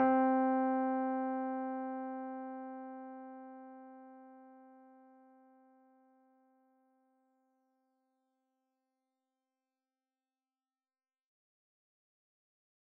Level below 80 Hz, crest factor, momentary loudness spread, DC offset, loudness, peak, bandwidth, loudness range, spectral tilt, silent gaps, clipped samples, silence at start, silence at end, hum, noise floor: under -90 dBFS; 22 dB; 24 LU; under 0.1%; -36 LUFS; -20 dBFS; 3 kHz; 24 LU; -5 dB/octave; none; under 0.1%; 0 s; 8.1 s; none; under -90 dBFS